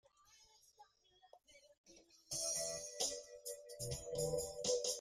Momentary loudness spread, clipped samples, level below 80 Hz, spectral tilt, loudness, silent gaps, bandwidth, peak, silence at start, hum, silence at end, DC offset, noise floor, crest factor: 11 LU; under 0.1%; -68 dBFS; -2 dB/octave; -42 LUFS; 1.78-1.84 s; 15.5 kHz; -24 dBFS; 0.3 s; none; 0 s; under 0.1%; -72 dBFS; 22 dB